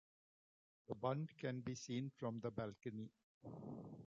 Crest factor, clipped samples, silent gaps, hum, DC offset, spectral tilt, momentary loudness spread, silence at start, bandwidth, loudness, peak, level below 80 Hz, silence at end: 20 dB; under 0.1%; 3.24-3.41 s; none; under 0.1%; -6.5 dB/octave; 11 LU; 0.9 s; 7.6 kHz; -48 LUFS; -28 dBFS; -78 dBFS; 0 s